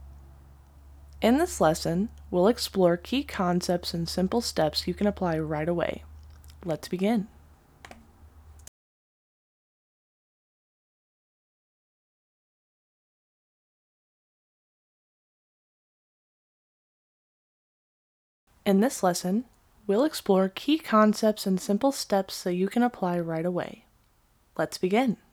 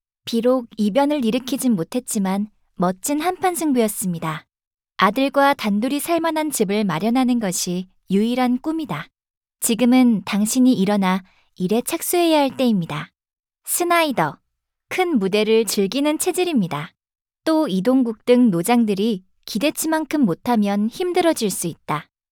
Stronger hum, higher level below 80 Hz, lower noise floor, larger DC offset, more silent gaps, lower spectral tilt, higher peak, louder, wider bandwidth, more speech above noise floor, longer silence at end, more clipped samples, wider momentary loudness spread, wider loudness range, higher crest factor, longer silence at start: neither; first, -54 dBFS vs -60 dBFS; second, -64 dBFS vs -75 dBFS; neither; first, 8.68-18.47 s vs 4.67-4.71 s, 9.37-9.41 s; about the same, -5.5 dB/octave vs -4.5 dB/octave; second, -8 dBFS vs -2 dBFS; second, -26 LUFS vs -20 LUFS; about the same, 18.5 kHz vs over 20 kHz; second, 39 dB vs 56 dB; second, 0.15 s vs 0.3 s; neither; about the same, 9 LU vs 10 LU; first, 9 LU vs 2 LU; about the same, 20 dB vs 18 dB; second, 0 s vs 0.25 s